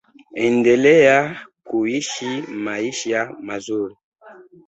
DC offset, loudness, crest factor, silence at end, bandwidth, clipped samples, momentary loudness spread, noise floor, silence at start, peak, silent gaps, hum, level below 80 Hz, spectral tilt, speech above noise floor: under 0.1%; -19 LUFS; 16 dB; 0.25 s; 8.2 kHz; under 0.1%; 15 LU; -45 dBFS; 0.35 s; -2 dBFS; 4.04-4.12 s; none; -62 dBFS; -4.5 dB/octave; 27 dB